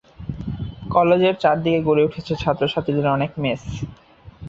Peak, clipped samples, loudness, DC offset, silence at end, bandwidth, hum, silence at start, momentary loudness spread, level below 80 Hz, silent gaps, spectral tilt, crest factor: -2 dBFS; under 0.1%; -20 LUFS; under 0.1%; 0 s; 7.6 kHz; none; 0.2 s; 15 LU; -44 dBFS; none; -7.5 dB/octave; 18 dB